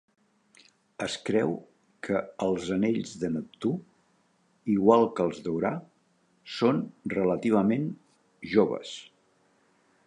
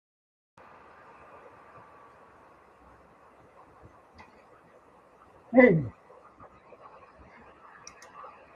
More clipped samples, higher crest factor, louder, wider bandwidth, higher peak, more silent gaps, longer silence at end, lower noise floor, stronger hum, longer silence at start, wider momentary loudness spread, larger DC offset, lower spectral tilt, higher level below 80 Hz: neither; second, 22 dB vs 28 dB; second, -28 LUFS vs -23 LUFS; first, 10.5 kHz vs 7 kHz; about the same, -6 dBFS vs -4 dBFS; neither; second, 1.05 s vs 2.65 s; first, -68 dBFS vs -57 dBFS; neither; second, 1 s vs 5.5 s; second, 15 LU vs 32 LU; neither; second, -6.5 dB/octave vs -8 dB/octave; about the same, -64 dBFS vs -64 dBFS